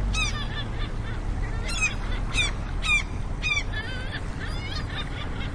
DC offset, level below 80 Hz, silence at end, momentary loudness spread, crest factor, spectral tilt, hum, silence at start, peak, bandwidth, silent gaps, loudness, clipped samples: under 0.1%; -30 dBFS; 0 s; 9 LU; 16 dB; -3.5 dB/octave; none; 0 s; -12 dBFS; 10.5 kHz; none; -28 LUFS; under 0.1%